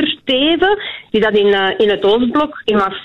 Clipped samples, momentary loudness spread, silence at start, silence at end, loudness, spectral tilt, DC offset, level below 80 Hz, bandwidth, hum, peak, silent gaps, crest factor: under 0.1%; 4 LU; 0 s; 0 s; -14 LUFS; -6 dB/octave; under 0.1%; -44 dBFS; 6.6 kHz; none; -4 dBFS; none; 10 dB